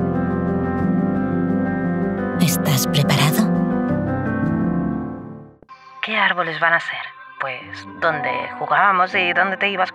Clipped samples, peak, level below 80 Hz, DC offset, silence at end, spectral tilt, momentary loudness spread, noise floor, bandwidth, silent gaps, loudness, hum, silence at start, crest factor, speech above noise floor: under 0.1%; -4 dBFS; -46 dBFS; under 0.1%; 0 s; -5 dB/octave; 11 LU; -43 dBFS; 16 kHz; none; -19 LUFS; none; 0 s; 16 dB; 24 dB